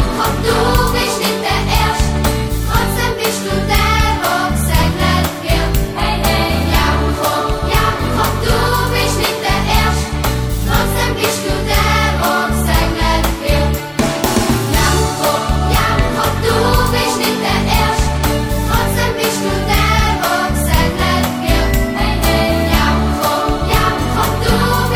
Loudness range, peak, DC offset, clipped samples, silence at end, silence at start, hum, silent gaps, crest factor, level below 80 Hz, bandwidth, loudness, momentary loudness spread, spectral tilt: 1 LU; 0 dBFS; under 0.1%; under 0.1%; 0 s; 0 s; none; none; 14 dB; -20 dBFS; over 20 kHz; -15 LUFS; 3 LU; -4.5 dB/octave